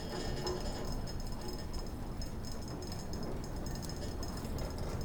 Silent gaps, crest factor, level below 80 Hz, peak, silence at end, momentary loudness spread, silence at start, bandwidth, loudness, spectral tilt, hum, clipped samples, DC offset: none; 16 dB; -42 dBFS; -24 dBFS; 0 s; 5 LU; 0 s; over 20 kHz; -42 LUFS; -5 dB/octave; none; under 0.1%; under 0.1%